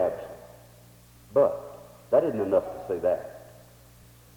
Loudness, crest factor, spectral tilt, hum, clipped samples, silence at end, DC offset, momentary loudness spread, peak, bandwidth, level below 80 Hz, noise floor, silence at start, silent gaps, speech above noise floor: -27 LUFS; 20 dB; -7 dB/octave; 60 Hz at -60 dBFS; under 0.1%; 0.85 s; under 0.1%; 21 LU; -8 dBFS; 19.5 kHz; -60 dBFS; -53 dBFS; 0 s; none; 28 dB